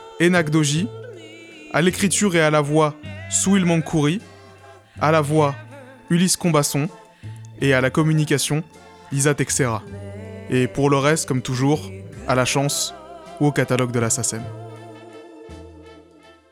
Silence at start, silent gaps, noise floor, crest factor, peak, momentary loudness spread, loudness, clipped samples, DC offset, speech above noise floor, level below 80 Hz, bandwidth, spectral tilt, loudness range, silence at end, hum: 0 s; none; -49 dBFS; 16 dB; -6 dBFS; 22 LU; -20 LUFS; under 0.1%; under 0.1%; 30 dB; -52 dBFS; 16 kHz; -4.5 dB/octave; 3 LU; 0.6 s; none